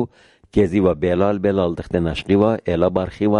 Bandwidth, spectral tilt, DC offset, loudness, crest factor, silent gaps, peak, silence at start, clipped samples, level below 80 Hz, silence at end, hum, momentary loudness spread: 10.5 kHz; -8.5 dB/octave; under 0.1%; -19 LUFS; 14 dB; none; -4 dBFS; 0 s; under 0.1%; -38 dBFS; 0 s; none; 5 LU